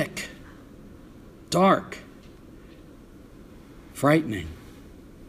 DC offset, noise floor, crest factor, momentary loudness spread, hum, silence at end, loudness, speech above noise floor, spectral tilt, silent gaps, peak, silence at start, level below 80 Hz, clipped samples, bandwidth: under 0.1%; -48 dBFS; 22 dB; 27 LU; none; 0 s; -24 LUFS; 25 dB; -5.5 dB/octave; none; -6 dBFS; 0 s; -52 dBFS; under 0.1%; 15.5 kHz